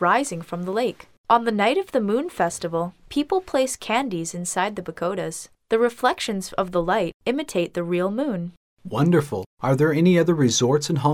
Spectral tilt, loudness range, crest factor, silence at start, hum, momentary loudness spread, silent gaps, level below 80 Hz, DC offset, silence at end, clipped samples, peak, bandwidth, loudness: -5 dB/octave; 3 LU; 18 dB; 0 s; none; 10 LU; 1.18-1.24 s, 7.14-7.20 s, 8.57-8.77 s, 9.46-9.57 s; -54 dBFS; under 0.1%; 0 s; under 0.1%; -4 dBFS; 16 kHz; -23 LUFS